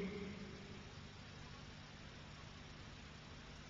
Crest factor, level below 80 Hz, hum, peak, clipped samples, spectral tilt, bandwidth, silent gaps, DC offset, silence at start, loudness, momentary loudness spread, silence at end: 18 dB; -64 dBFS; 50 Hz at -60 dBFS; -36 dBFS; under 0.1%; -4.5 dB/octave; 7.4 kHz; none; under 0.1%; 0 s; -54 LUFS; 5 LU; 0 s